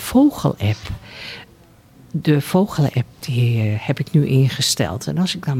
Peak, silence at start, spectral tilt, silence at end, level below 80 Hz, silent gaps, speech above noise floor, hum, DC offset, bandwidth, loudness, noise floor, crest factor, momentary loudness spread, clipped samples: -4 dBFS; 0 s; -5.5 dB/octave; 0 s; -46 dBFS; none; 30 dB; none; under 0.1%; 16.5 kHz; -19 LUFS; -48 dBFS; 14 dB; 16 LU; under 0.1%